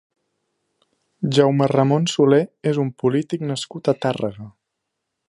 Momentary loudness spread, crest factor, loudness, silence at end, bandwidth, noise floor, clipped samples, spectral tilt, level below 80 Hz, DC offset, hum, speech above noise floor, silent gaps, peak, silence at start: 10 LU; 18 dB; -20 LUFS; 0.8 s; 11.5 kHz; -79 dBFS; under 0.1%; -6.5 dB/octave; -64 dBFS; under 0.1%; none; 60 dB; none; -2 dBFS; 1.2 s